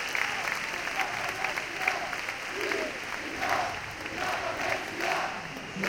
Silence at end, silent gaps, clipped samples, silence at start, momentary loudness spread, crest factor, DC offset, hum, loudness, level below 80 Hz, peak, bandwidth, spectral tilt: 0 s; none; under 0.1%; 0 s; 5 LU; 22 dB; under 0.1%; none; -31 LUFS; -58 dBFS; -10 dBFS; 17 kHz; -2.5 dB/octave